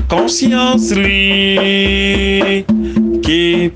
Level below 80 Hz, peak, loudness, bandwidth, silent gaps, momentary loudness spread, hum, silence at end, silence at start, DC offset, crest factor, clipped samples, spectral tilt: -26 dBFS; 0 dBFS; -12 LUFS; 9.8 kHz; none; 4 LU; none; 0 s; 0 s; under 0.1%; 12 dB; under 0.1%; -4 dB/octave